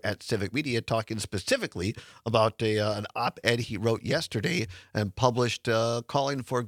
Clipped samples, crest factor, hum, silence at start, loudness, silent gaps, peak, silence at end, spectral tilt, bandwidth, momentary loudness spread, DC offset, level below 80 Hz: under 0.1%; 22 dB; none; 0.05 s; -28 LUFS; none; -6 dBFS; 0 s; -5 dB/octave; 16 kHz; 7 LU; under 0.1%; -60 dBFS